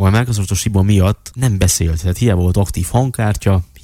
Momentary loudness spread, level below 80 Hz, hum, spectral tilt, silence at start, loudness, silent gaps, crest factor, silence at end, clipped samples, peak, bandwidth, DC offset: 4 LU; -28 dBFS; none; -5.5 dB/octave; 0 s; -15 LUFS; none; 14 dB; 0.2 s; under 0.1%; 0 dBFS; 16 kHz; under 0.1%